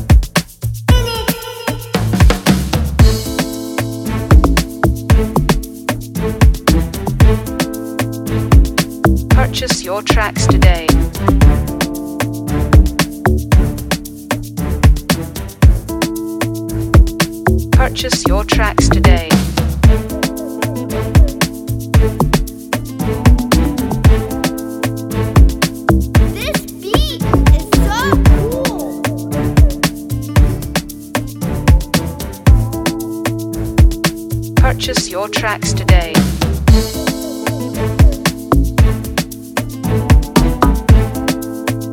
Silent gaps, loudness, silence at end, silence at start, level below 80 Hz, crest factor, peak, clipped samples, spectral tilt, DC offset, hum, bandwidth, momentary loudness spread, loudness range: none; -15 LUFS; 0 s; 0 s; -16 dBFS; 12 dB; 0 dBFS; under 0.1%; -5.5 dB/octave; under 0.1%; none; 17 kHz; 9 LU; 2 LU